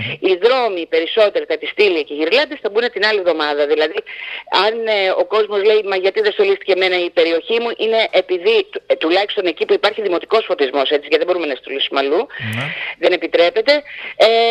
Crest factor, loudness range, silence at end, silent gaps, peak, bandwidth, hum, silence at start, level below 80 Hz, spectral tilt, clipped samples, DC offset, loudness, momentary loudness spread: 16 dB; 2 LU; 0 s; none; 0 dBFS; 10.5 kHz; none; 0 s; -66 dBFS; -5 dB/octave; under 0.1%; under 0.1%; -16 LUFS; 6 LU